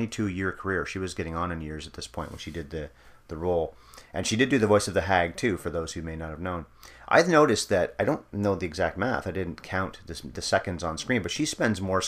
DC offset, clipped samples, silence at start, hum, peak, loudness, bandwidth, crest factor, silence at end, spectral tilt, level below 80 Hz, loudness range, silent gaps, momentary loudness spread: under 0.1%; under 0.1%; 0 s; none; -4 dBFS; -27 LUFS; 15.5 kHz; 24 dB; 0 s; -4.5 dB/octave; -48 dBFS; 7 LU; none; 15 LU